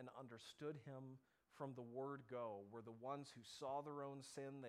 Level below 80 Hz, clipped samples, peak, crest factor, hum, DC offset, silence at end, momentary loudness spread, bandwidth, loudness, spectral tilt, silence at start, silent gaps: under -90 dBFS; under 0.1%; -36 dBFS; 18 dB; none; under 0.1%; 0 s; 9 LU; 15 kHz; -54 LUFS; -5.5 dB/octave; 0 s; none